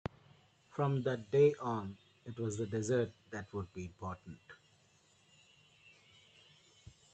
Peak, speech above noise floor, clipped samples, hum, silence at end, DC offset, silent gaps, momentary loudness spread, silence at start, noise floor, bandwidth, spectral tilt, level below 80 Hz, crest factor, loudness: -18 dBFS; 33 dB; under 0.1%; none; 2.6 s; under 0.1%; none; 20 LU; 0.75 s; -69 dBFS; 8.8 kHz; -6.5 dB/octave; -72 dBFS; 20 dB; -36 LUFS